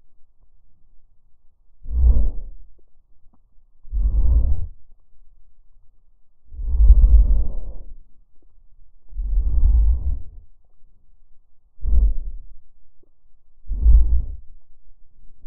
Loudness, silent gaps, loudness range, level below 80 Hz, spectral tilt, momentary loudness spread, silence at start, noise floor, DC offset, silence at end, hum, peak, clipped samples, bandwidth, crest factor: -22 LUFS; none; 6 LU; -20 dBFS; -16.5 dB/octave; 24 LU; 0.05 s; -46 dBFS; under 0.1%; 0.05 s; none; 0 dBFS; under 0.1%; 1.1 kHz; 18 dB